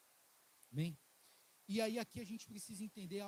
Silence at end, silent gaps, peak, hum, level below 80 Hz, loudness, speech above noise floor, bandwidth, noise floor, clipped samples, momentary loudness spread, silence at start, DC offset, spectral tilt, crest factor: 0 s; none; -24 dBFS; none; -82 dBFS; -45 LUFS; 27 dB; 16.5 kHz; -71 dBFS; under 0.1%; 11 LU; 0.7 s; under 0.1%; -5 dB/octave; 22 dB